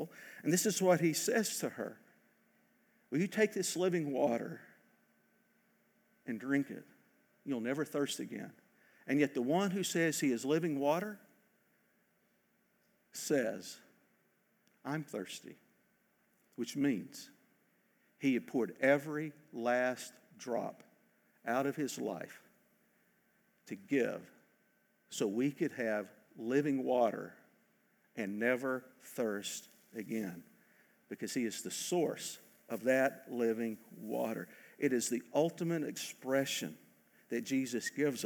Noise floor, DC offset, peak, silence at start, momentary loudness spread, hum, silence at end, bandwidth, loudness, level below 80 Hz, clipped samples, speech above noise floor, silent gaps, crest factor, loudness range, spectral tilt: -75 dBFS; under 0.1%; -16 dBFS; 0 s; 17 LU; none; 0 s; over 20 kHz; -36 LUFS; under -90 dBFS; under 0.1%; 40 dB; none; 22 dB; 7 LU; -4.5 dB/octave